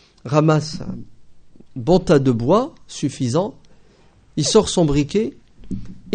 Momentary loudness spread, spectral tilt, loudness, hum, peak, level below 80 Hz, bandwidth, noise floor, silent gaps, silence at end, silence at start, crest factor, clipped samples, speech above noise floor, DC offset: 17 LU; -6 dB/octave; -19 LUFS; none; 0 dBFS; -40 dBFS; 9.4 kHz; -51 dBFS; none; 0 s; 0.25 s; 20 dB; under 0.1%; 33 dB; under 0.1%